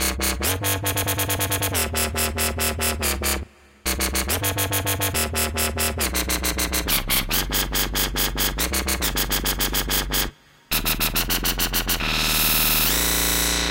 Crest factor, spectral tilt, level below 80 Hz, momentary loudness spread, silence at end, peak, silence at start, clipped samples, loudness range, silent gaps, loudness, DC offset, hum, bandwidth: 18 dB; -2 dB/octave; -32 dBFS; 5 LU; 0 s; -6 dBFS; 0 s; under 0.1%; 3 LU; none; -21 LUFS; under 0.1%; none; 17 kHz